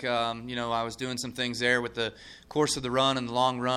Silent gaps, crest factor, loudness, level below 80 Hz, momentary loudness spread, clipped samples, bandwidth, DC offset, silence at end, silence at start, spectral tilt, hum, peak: none; 18 dB; -28 LUFS; -58 dBFS; 8 LU; under 0.1%; 14.5 kHz; under 0.1%; 0 s; 0 s; -3.5 dB/octave; none; -10 dBFS